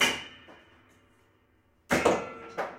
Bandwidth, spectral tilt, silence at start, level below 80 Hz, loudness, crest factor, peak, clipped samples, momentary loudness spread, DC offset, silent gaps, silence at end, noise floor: 16 kHz; -2.5 dB/octave; 0 s; -58 dBFS; -29 LUFS; 22 dB; -10 dBFS; under 0.1%; 19 LU; under 0.1%; none; 0 s; -66 dBFS